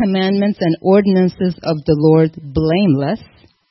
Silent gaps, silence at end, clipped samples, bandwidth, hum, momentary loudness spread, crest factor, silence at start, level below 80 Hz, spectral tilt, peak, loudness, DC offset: none; 0.45 s; under 0.1%; 6 kHz; none; 8 LU; 14 dB; 0 s; -44 dBFS; -10 dB/octave; 0 dBFS; -15 LUFS; under 0.1%